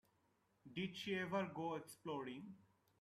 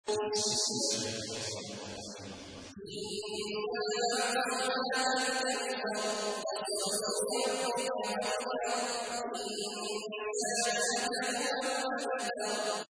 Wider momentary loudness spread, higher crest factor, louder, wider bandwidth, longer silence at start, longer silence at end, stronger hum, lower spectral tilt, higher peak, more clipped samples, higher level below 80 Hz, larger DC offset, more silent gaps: first, 13 LU vs 10 LU; about the same, 18 dB vs 16 dB; second, -46 LUFS vs -33 LUFS; first, 14 kHz vs 11 kHz; first, 0.65 s vs 0.05 s; first, 0.4 s vs 0.1 s; neither; first, -5.5 dB/octave vs -1.5 dB/octave; second, -30 dBFS vs -18 dBFS; neither; second, -84 dBFS vs -72 dBFS; neither; neither